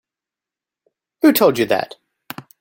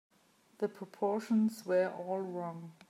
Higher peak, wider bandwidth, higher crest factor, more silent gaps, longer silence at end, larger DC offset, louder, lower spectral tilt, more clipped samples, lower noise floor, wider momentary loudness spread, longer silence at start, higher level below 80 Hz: first, -2 dBFS vs -20 dBFS; about the same, 17 kHz vs 15.5 kHz; about the same, 18 dB vs 14 dB; neither; about the same, 0.2 s vs 0.2 s; neither; first, -16 LUFS vs -35 LUFS; second, -4.5 dB/octave vs -7 dB/octave; neither; first, -88 dBFS vs -68 dBFS; first, 22 LU vs 8 LU; first, 1.25 s vs 0.6 s; first, -62 dBFS vs -90 dBFS